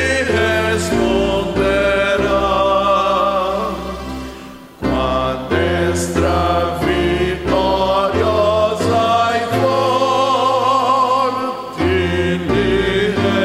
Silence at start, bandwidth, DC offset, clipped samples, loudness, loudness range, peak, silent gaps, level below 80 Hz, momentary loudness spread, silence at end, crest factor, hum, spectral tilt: 0 s; 16 kHz; under 0.1%; under 0.1%; -16 LUFS; 3 LU; -4 dBFS; none; -32 dBFS; 6 LU; 0 s; 12 dB; none; -5.5 dB/octave